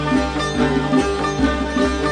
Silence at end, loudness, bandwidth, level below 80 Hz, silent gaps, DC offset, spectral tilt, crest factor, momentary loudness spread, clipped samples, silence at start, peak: 0 s; -19 LUFS; 10 kHz; -30 dBFS; none; under 0.1%; -5.5 dB/octave; 14 dB; 2 LU; under 0.1%; 0 s; -4 dBFS